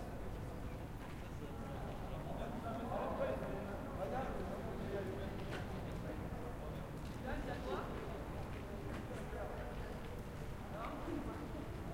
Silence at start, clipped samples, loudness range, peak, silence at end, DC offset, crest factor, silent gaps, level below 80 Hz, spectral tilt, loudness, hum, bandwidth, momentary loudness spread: 0 s; under 0.1%; 3 LU; -28 dBFS; 0 s; under 0.1%; 16 dB; none; -50 dBFS; -7 dB/octave; -45 LUFS; none; 16 kHz; 6 LU